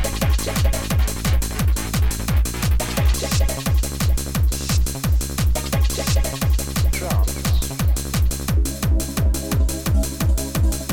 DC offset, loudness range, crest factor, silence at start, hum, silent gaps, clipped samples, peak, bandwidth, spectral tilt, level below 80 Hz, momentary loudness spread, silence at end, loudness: under 0.1%; 0 LU; 12 dB; 0 s; none; none; under 0.1%; -8 dBFS; 19 kHz; -4.5 dB/octave; -22 dBFS; 1 LU; 0 s; -21 LUFS